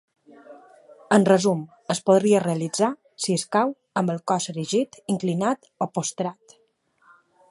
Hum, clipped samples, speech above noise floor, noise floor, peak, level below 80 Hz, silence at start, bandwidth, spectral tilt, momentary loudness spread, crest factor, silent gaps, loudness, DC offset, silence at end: none; under 0.1%; 42 dB; -65 dBFS; -4 dBFS; -72 dBFS; 0.5 s; 11.5 kHz; -5 dB/octave; 11 LU; 20 dB; none; -23 LUFS; under 0.1%; 1.2 s